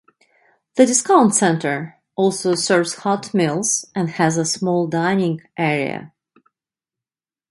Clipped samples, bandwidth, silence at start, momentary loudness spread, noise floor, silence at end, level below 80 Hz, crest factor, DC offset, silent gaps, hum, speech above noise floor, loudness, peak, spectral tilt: under 0.1%; 11.5 kHz; 0.75 s; 10 LU; under -90 dBFS; 1.45 s; -64 dBFS; 18 dB; under 0.1%; none; none; over 72 dB; -18 LUFS; 0 dBFS; -4 dB/octave